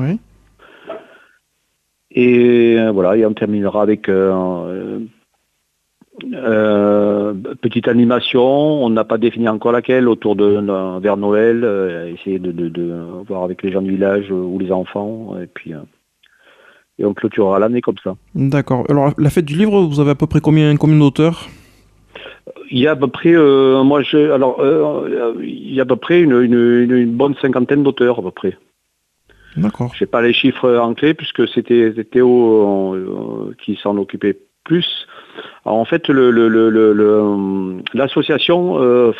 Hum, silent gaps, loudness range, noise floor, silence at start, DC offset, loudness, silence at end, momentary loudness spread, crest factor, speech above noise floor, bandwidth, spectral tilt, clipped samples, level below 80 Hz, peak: none; none; 6 LU; -67 dBFS; 0 s; under 0.1%; -14 LUFS; 0 s; 14 LU; 14 dB; 54 dB; 11 kHz; -8 dB/octave; under 0.1%; -50 dBFS; -2 dBFS